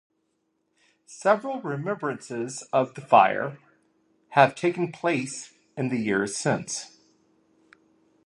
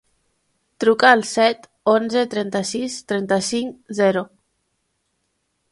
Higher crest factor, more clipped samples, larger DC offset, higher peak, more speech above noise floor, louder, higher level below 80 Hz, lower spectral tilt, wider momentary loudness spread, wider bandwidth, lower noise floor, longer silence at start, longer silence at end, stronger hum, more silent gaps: about the same, 24 dB vs 20 dB; neither; neither; second, -4 dBFS vs 0 dBFS; second, 49 dB vs 53 dB; second, -25 LUFS vs -19 LUFS; second, -72 dBFS vs -66 dBFS; about the same, -5 dB/octave vs -4 dB/octave; about the same, 14 LU vs 12 LU; about the same, 11.5 kHz vs 11.5 kHz; about the same, -74 dBFS vs -71 dBFS; first, 1.1 s vs 0.8 s; about the same, 1.4 s vs 1.45 s; neither; neither